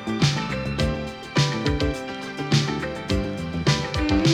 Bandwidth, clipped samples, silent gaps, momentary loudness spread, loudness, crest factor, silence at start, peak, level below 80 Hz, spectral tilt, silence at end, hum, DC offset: 13 kHz; under 0.1%; none; 7 LU; -24 LUFS; 18 dB; 0 s; -6 dBFS; -36 dBFS; -5.5 dB/octave; 0 s; none; under 0.1%